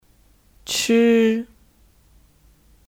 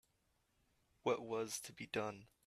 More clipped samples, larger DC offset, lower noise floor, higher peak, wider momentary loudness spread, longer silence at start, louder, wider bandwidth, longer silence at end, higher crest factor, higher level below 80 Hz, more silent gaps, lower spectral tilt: neither; neither; second, -56 dBFS vs -81 dBFS; first, -8 dBFS vs -24 dBFS; first, 22 LU vs 5 LU; second, 0.65 s vs 1.05 s; first, -18 LUFS vs -43 LUFS; about the same, 17 kHz vs 15.5 kHz; first, 1.5 s vs 0.2 s; second, 16 dB vs 22 dB; first, -56 dBFS vs -80 dBFS; neither; about the same, -3.5 dB/octave vs -3.5 dB/octave